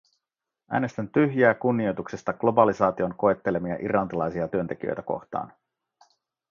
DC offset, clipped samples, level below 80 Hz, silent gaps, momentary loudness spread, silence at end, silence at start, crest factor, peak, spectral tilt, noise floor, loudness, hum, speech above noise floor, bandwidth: under 0.1%; under 0.1%; -58 dBFS; none; 11 LU; 1.05 s; 0.7 s; 22 dB; -4 dBFS; -8 dB/octave; -87 dBFS; -25 LUFS; none; 62 dB; 7.4 kHz